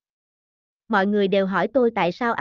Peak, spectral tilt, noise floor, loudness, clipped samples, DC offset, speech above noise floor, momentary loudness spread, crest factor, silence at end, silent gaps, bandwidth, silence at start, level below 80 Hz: -8 dBFS; -7.5 dB/octave; under -90 dBFS; -21 LUFS; under 0.1%; under 0.1%; over 70 dB; 3 LU; 14 dB; 0 s; none; 7 kHz; 0.9 s; -62 dBFS